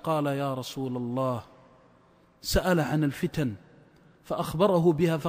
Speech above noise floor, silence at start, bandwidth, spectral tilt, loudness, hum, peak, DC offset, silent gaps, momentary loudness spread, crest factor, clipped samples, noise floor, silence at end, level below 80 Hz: 34 dB; 0.05 s; 16 kHz; -6 dB/octave; -28 LUFS; none; -10 dBFS; under 0.1%; none; 11 LU; 18 dB; under 0.1%; -60 dBFS; 0 s; -44 dBFS